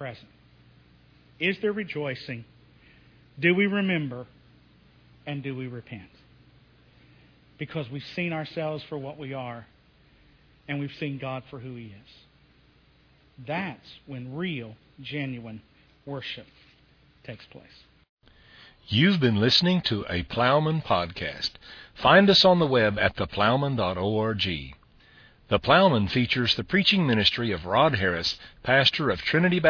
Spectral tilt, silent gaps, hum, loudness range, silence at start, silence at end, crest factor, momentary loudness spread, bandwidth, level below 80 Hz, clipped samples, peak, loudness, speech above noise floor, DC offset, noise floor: -6 dB/octave; 18.09-18.17 s; none; 17 LU; 0 s; 0 s; 24 dB; 21 LU; 5.4 kHz; -54 dBFS; under 0.1%; -4 dBFS; -24 LUFS; 34 dB; under 0.1%; -60 dBFS